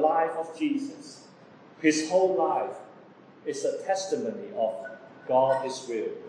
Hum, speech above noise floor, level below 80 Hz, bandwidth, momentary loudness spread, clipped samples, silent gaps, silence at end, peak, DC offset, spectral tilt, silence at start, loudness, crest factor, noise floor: none; 24 dB; -88 dBFS; 10.5 kHz; 18 LU; under 0.1%; none; 0 s; -10 dBFS; under 0.1%; -4 dB/octave; 0 s; -28 LUFS; 20 dB; -52 dBFS